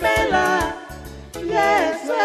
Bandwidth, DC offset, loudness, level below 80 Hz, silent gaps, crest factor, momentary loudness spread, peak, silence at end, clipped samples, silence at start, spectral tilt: 13 kHz; under 0.1%; -19 LUFS; -40 dBFS; none; 16 dB; 18 LU; -4 dBFS; 0 s; under 0.1%; 0 s; -4 dB/octave